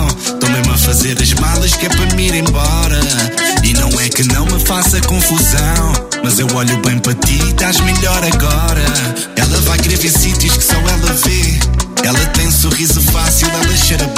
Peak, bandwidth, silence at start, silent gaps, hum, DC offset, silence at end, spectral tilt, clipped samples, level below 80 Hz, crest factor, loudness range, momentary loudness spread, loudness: 0 dBFS; 16.5 kHz; 0 s; none; none; under 0.1%; 0 s; -3.5 dB/octave; under 0.1%; -16 dBFS; 12 dB; 1 LU; 3 LU; -11 LUFS